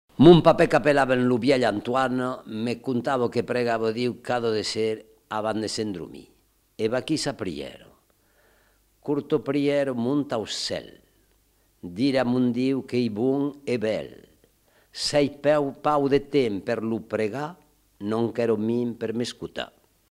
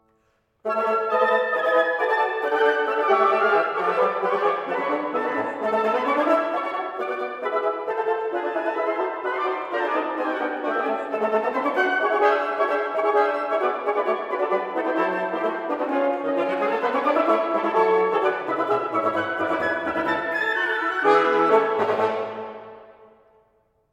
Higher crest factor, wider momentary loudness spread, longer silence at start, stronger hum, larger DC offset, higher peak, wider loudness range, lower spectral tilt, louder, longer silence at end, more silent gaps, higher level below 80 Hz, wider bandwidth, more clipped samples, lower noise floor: first, 24 dB vs 18 dB; first, 13 LU vs 6 LU; second, 0.2 s vs 0.65 s; neither; neither; about the same, -2 dBFS vs -4 dBFS; about the same, 6 LU vs 4 LU; about the same, -6 dB/octave vs -5.5 dB/octave; about the same, -24 LUFS vs -22 LUFS; second, 0.45 s vs 1 s; neither; first, -52 dBFS vs -68 dBFS; first, 14 kHz vs 11.5 kHz; neither; about the same, -64 dBFS vs -67 dBFS